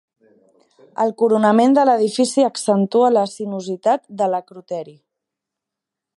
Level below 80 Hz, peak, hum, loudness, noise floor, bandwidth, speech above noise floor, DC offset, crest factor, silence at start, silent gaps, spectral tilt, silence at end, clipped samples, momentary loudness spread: -72 dBFS; -2 dBFS; none; -17 LUFS; -84 dBFS; 11.5 kHz; 67 dB; under 0.1%; 16 dB; 1 s; none; -5.5 dB/octave; 1.25 s; under 0.1%; 15 LU